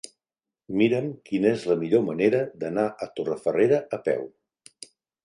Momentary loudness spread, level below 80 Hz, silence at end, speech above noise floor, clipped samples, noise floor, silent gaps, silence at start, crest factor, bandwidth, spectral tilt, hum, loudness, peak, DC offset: 21 LU; -68 dBFS; 0.95 s; over 66 dB; under 0.1%; under -90 dBFS; none; 0.7 s; 18 dB; 11 kHz; -6.5 dB/octave; none; -25 LUFS; -8 dBFS; under 0.1%